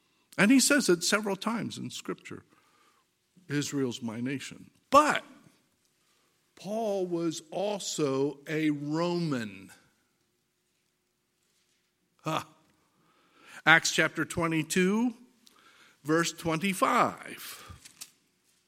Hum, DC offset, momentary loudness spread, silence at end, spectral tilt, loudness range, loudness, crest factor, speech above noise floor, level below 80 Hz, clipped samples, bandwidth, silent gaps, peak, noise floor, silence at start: none; under 0.1%; 20 LU; 0.65 s; -4 dB/octave; 11 LU; -28 LUFS; 28 dB; 48 dB; -68 dBFS; under 0.1%; 16.5 kHz; none; -4 dBFS; -77 dBFS; 0.35 s